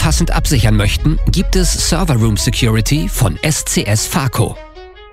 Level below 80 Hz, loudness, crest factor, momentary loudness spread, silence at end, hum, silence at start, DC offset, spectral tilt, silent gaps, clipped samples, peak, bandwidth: -20 dBFS; -14 LUFS; 12 dB; 3 LU; 0.05 s; none; 0 s; under 0.1%; -4.5 dB/octave; none; under 0.1%; 0 dBFS; 16 kHz